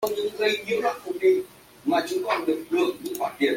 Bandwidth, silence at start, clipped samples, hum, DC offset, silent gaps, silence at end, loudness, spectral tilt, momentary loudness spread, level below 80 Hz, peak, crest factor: 16.5 kHz; 0 s; under 0.1%; none; under 0.1%; none; 0 s; -25 LUFS; -3.5 dB/octave; 7 LU; -66 dBFS; -8 dBFS; 16 dB